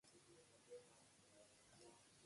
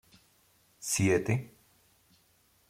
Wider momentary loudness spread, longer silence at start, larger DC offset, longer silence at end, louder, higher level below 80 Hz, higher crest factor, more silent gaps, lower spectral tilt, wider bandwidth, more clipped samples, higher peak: second, 6 LU vs 16 LU; second, 0.05 s vs 0.8 s; neither; second, 0 s vs 1.25 s; second, -67 LUFS vs -30 LUFS; second, under -90 dBFS vs -64 dBFS; about the same, 18 dB vs 20 dB; neither; second, -3 dB/octave vs -5 dB/octave; second, 11.5 kHz vs 16.5 kHz; neither; second, -50 dBFS vs -14 dBFS